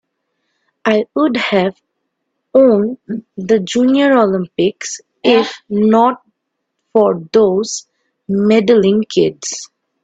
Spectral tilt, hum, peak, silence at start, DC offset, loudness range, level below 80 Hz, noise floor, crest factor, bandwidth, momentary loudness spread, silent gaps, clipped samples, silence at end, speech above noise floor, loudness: -5 dB/octave; none; 0 dBFS; 0.85 s; under 0.1%; 2 LU; -58 dBFS; -73 dBFS; 14 dB; 8.4 kHz; 13 LU; none; under 0.1%; 0.4 s; 60 dB; -14 LUFS